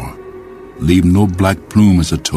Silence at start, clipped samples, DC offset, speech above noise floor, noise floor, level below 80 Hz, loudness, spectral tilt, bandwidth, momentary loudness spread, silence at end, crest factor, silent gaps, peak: 0 s; under 0.1%; under 0.1%; 21 dB; -33 dBFS; -30 dBFS; -13 LUFS; -6 dB/octave; 15 kHz; 22 LU; 0 s; 14 dB; none; 0 dBFS